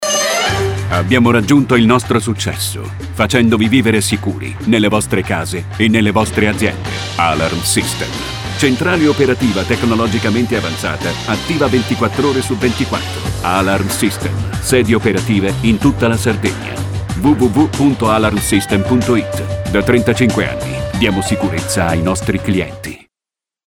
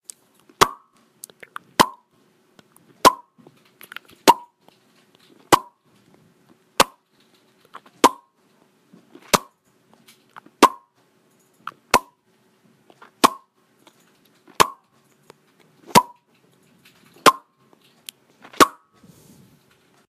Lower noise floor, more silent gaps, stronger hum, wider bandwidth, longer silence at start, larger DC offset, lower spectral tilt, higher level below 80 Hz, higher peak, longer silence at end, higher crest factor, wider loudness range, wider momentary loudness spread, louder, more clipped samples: first, -89 dBFS vs -62 dBFS; neither; neither; first, 17.5 kHz vs 15.5 kHz; second, 0 s vs 0.6 s; first, 0.1% vs under 0.1%; first, -5 dB/octave vs -2.5 dB/octave; first, -34 dBFS vs -56 dBFS; about the same, 0 dBFS vs 0 dBFS; second, 0.7 s vs 1.4 s; second, 14 dB vs 24 dB; about the same, 2 LU vs 4 LU; second, 8 LU vs 24 LU; first, -14 LUFS vs -19 LUFS; neither